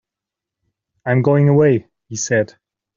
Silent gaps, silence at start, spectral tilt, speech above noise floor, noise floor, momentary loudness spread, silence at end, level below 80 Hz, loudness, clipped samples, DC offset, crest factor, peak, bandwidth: none; 1.05 s; -7.5 dB/octave; 71 dB; -85 dBFS; 15 LU; 0.5 s; -58 dBFS; -16 LUFS; under 0.1%; under 0.1%; 16 dB; -2 dBFS; 7.6 kHz